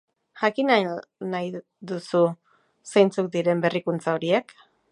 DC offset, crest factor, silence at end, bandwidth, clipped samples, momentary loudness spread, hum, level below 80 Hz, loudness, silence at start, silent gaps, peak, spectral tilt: under 0.1%; 20 dB; 0.5 s; 11.5 kHz; under 0.1%; 13 LU; none; -76 dBFS; -24 LUFS; 0.35 s; none; -4 dBFS; -6 dB/octave